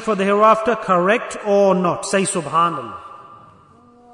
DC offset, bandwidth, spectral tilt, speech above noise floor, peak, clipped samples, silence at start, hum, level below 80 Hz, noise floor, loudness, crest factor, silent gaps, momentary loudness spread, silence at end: under 0.1%; 11 kHz; -4.5 dB/octave; 32 dB; -4 dBFS; under 0.1%; 0 s; none; -60 dBFS; -49 dBFS; -17 LUFS; 16 dB; none; 7 LU; 0.8 s